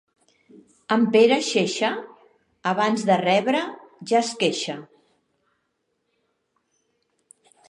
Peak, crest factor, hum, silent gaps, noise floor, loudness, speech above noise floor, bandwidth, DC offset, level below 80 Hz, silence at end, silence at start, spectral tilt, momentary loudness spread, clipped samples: -4 dBFS; 20 dB; none; none; -74 dBFS; -21 LUFS; 53 dB; 11 kHz; under 0.1%; -78 dBFS; 2.85 s; 0.9 s; -4 dB/octave; 15 LU; under 0.1%